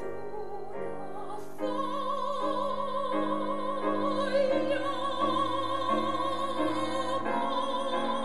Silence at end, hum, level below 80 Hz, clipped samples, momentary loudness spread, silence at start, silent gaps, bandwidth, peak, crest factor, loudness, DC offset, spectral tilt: 0 s; none; -66 dBFS; under 0.1%; 11 LU; 0 s; none; 12 kHz; -16 dBFS; 14 dB; -31 LUFS; 2%; -5 dB/octave